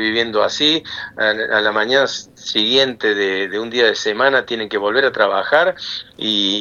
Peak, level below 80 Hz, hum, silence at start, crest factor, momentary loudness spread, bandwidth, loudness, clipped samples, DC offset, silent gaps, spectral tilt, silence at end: 0 dBFS; -60 dBFS; none; 0 s; 18 dB; 7 LU; 8 kHz; -16 LUFS; under 0.1%; under 0.1%; none; -2.5 dB/octave; 0 s